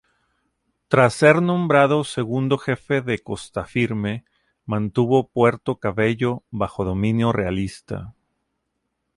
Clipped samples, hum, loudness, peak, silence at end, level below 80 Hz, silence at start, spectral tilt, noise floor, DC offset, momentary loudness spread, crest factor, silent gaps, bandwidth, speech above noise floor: under 0.1%; none; -21 LUFS; -2 dBFS; 1.05 s; -48 dBFS; 0.9 s; -6.5 dB/octave; -76 dBFS; under 0.1%; 12 LU; 20 dB; none; 11.5 kHz; 56 dB